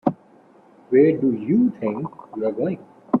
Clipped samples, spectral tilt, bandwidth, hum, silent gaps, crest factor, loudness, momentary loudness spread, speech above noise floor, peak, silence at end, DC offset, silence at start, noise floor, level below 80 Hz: under 0.1%; -11 dB/octave; 4.2 kHz; none; none; 18 dB; -21 LUFS; 13 LU; 32 dB; -4 dBFS; 0 s; under 0.1%; 0.05 s; -52 dBFS; -64 dBFS